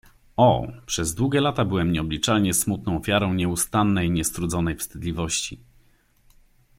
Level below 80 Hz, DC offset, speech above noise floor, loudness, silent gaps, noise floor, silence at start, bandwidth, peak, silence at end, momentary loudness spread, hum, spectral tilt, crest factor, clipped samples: -44 dBFS; under 0.1%; 36 dB; -23 LUFS; none; -59 dBFS; 0.4 s; 16.5 kHz; -6 dBFS; 1.25 s; 8 LU; none; -4.5 dB/octave; 18 dB; under 0.1%